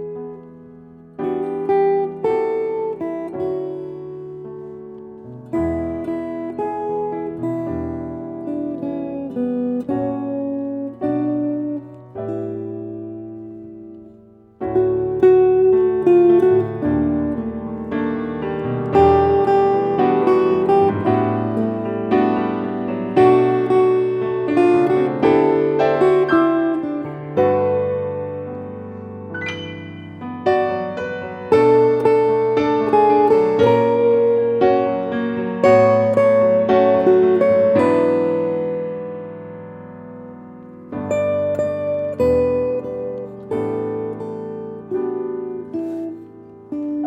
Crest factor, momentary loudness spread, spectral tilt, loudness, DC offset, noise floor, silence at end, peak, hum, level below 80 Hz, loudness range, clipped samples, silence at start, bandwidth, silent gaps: 16 dB; 18 LU; -8.5 dB/octave; -18 LUFS; under 0.1%; -46 dBFS; 0 s; -2 dBFS; none; -48 dBFS; 10 LU; under 0.1%; 0 s; 8.4 kHz; none